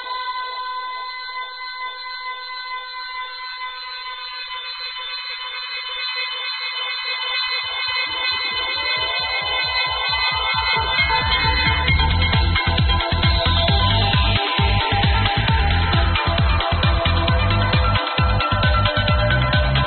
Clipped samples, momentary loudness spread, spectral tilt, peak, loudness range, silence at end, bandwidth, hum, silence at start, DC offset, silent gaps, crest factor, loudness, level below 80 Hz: under 0.1%; 11 LU; -2.5 dB/octave; -2 dBFS; 11 LU; 0 s; 4.6 kHz; none; 0 s; under 0.1%; none; 18 dB; -19 LUFS; -26 dBFS